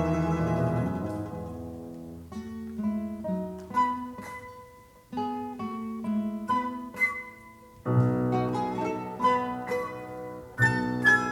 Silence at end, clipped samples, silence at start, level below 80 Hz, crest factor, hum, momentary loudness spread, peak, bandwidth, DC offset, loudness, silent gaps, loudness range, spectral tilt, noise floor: 0 s; under 0.1%; 0 s; -52 dBFS; 20 dB; none; 15 LU; -10 dBFS; 17.5 kHz; under 0.1%; -29 LUFS; none; 5 LU; -7 dB/octave; -52 dBFS